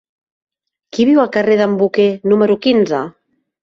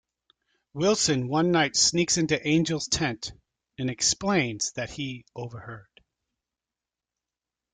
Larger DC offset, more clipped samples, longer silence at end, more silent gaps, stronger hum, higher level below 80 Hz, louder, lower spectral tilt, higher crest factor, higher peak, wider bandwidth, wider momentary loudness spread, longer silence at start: neither; neither; second, 0.55 s vs 1.9 s; neither; neither; about the same, -58 dBFS vs -58 dBFS; first, -14 LUFS vs -25 LUFS; first, -6.5 dB/octave vs -3.5 dB/octave; about the same, 14 dB vs 18 dB; first, -2 dBFS vs -10 dBFS; second, 7.4 kHz vs 10 kHz; second, 8 LU vs 17 LU; first, 0.95 s vs 0.75 s